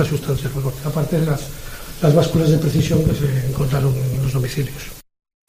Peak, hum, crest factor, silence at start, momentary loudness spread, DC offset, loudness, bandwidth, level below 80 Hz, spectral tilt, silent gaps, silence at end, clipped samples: -2 dBFS; none; 16 dB; 0 s; 12 LU; under 0.1%; -19 LUFS; 15.5 kHz; -34 dBFS; -7 dB/octave; none; 0.45 s; under 0.1%